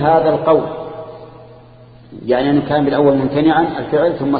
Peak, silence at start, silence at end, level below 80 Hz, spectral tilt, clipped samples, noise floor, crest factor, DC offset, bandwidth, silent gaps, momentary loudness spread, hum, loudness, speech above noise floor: 0 dBFS; 0 s; 0 s; -46 dBFS; -12.5 dB/octave; under 0.1%; -41 dBFS; 14 dB; under 0.1%; 4.9 kHz; none; 16 LU; none; -15 LUFS; 27 dB